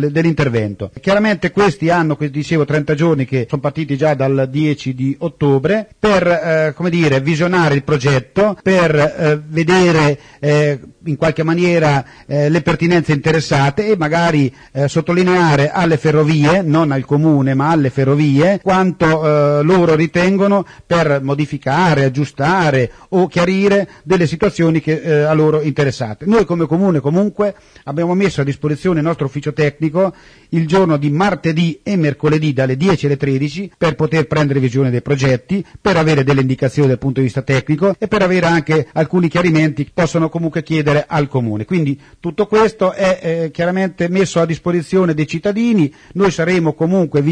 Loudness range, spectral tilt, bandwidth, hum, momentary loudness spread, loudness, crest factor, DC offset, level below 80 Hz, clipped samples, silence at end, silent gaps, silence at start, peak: 3 LU; -7 dB/octave; 10 kHz; none; 6 LU; -15 LUFS; 14 dB; under 0.1%; -44 dBFS; under 0.1%; 0 s; none; 0 s; 0 dBFS